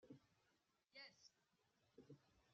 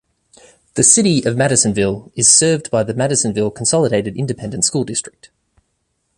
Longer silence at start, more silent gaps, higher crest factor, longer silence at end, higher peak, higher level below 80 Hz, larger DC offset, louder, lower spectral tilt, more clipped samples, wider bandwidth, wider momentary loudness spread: second, 0 s vs 0.75 s; neither; about the same, 22 dB vs 18 dB; second, 0 s vs 1.1 s; second, -48 dBFS vs 0 dBFS; second, under -90 dBFS vs -48 dBFS; neither; second, -65 LUFS vs -14 LUFS; about the same, -3 dB/octave vs -3.5 dB/octave; neither; second, 7.2 kHz vs 12.5 kHz; second, 6 LU vs 12 LU